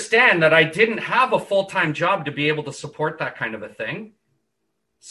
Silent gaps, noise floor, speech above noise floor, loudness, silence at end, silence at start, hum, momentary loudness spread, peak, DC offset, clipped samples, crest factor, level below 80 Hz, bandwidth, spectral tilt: none; -76 dBFS; 55 dB; -19 LUFS; 0 s; 0 s; none; 15 LU; -2 dBFS; under 0.1%; under 0.1%; 18 dB; -64 dBFS; 12 kHz; -4.5 dB/octave